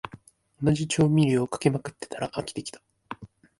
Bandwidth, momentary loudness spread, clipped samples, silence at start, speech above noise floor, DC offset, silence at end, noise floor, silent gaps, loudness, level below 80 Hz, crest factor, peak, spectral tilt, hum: 11.5 kHz; 21 LU; under 0.1%; 0.05 s; 26 dB; under 0.1%; 0.35 s; -51 dBFS; none; -26 LUFS; -56 dBFS; 18 dB; -8 dBFS; -6 dB/octave; none